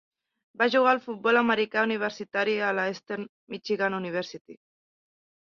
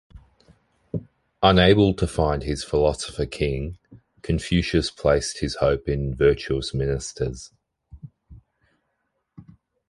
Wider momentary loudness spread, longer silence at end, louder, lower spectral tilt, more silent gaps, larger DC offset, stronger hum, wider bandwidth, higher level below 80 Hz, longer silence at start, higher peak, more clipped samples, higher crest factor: about the same, 14 LU vs 16 LU; first, 1.05 s vs 0.5 s; second, -26 LUFS vs -23 LUFS; about the same, -5 dB/octave vs -5.5 dB/octave; first, 3.29-3.47 s, 4.41-4.45 s vs none; neither; neither; second, 7.2 kHz vs 11.5 kHz; second, -74 dBFS vs -36 dBFS; first, 0.6 s vs 0.15 s; second, -8 dBFS vs -2 dBFS; neither; about the same, 20 dB vs 22 dB